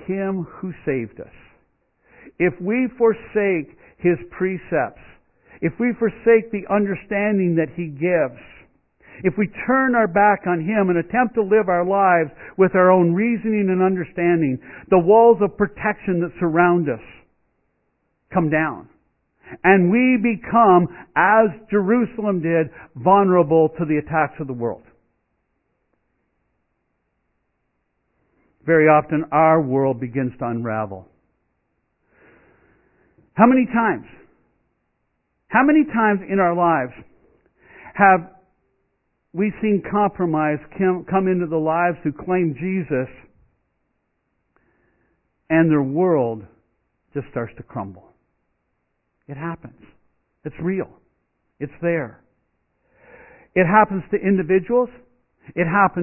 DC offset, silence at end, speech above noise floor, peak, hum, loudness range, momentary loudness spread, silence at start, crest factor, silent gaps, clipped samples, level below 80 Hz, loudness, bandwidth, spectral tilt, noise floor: under 0.1%; 0 s; 53 dB; 0 dBFS; none; 12 LU; 15 LU; 0 s; 20 dB; none; under 0.1%; -56 dBFS; -19 LUFS; 3.1 kHz; -12.5 dB/octave; -72 dBFS